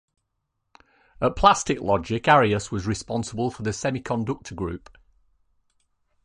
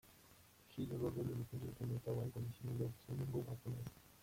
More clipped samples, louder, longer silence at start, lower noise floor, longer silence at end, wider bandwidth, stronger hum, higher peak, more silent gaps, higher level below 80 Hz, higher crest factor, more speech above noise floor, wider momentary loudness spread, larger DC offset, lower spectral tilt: neither; first, -23 LUFS vs -46 LUFS; first, 1.2 s vs 0.05 s; first, -77 dBFS vs -66 dBFS; first, 1.45 s vs 0 s; second, 11 kHz vs 16.5 kHz; neither; first, -2 dBFS vs -30 dBFS; neither; first, -44 dBFS vs -66 dBFS; first, 22 dB vs 16 dB; first, 54 dB vs 22 dB; about the same, 13 LU vs 14 LU; neither; second, -5 dB/octave vs -8 dB/octave